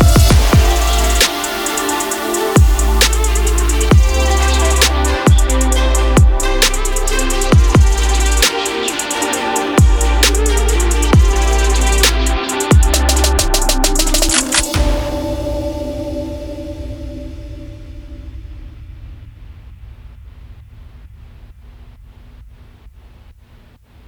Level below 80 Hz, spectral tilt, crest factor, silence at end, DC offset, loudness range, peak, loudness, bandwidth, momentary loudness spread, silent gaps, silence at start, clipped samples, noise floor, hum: -16 dBFS; -4 dB/octave; 14 dB; 1.2 s; under 0.1%; 14 LU; 0 dBFS; -14 LUFS; over 20 kHz; 16 LU; none; 0 s; under 0.1%; -44 dBFS; none